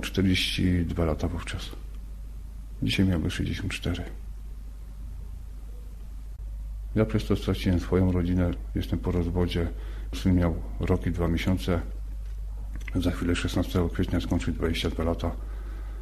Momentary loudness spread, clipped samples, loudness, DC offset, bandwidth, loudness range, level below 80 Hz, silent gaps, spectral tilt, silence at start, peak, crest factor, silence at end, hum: 18 LU; under 0.1%; -28 LUFS; under 0.1%; 13.5 kHz; 6 LU; -34 dBFS; none; -6.5 dB/octave; 0 s; -10 dBFS; 16 dB; 0 s; none